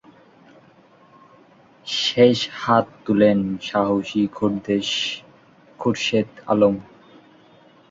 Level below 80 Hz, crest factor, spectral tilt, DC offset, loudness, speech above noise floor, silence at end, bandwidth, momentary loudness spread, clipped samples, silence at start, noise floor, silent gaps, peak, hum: -58 dBFS; 20 dB; -5 dB/octave; under 0.1%; -20 LUFS; 33 dB; 1.1 s; 7.8 kHz; 10 LU; under 0.1%; 1.85 s; -52 dBFS; none; -2 dBFS; none